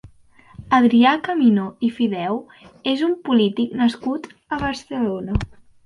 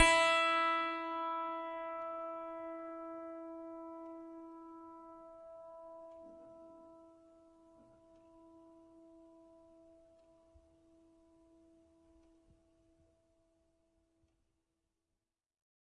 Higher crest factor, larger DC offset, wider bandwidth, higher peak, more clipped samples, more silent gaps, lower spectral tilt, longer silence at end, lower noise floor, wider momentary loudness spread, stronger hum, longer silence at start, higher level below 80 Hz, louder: second, 16 dB vs 28 dB; neither; about the same, 10.5 kHz vs 10.5 kHz; first, -4 dBFS vs -14 dBFS; neither; neither; first, -6.5 dB/octave vs -2 dB/octave; second, 0.4 s vs 6.45 s; second, -50 dBFS vs under -90 dBFS; second, 12 LU vs 26 LU; neither; about the same, 0.05 s vs 0 s; first, -42 dBFS vs -66 dBFS; first, -20 LUFS vs -36 LUFS